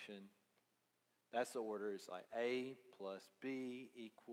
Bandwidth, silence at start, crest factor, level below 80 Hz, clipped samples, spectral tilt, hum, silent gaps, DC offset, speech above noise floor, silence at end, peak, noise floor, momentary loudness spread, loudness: 16 kHz; 0 s; 20 dB; under -90 dBFS; under 0.1%; -4.5 dB/octave; none; none; under 0.1%; 37 dB; 0 s; -28 dBFS; -84 dBFS; 13 LU; -47 LUFS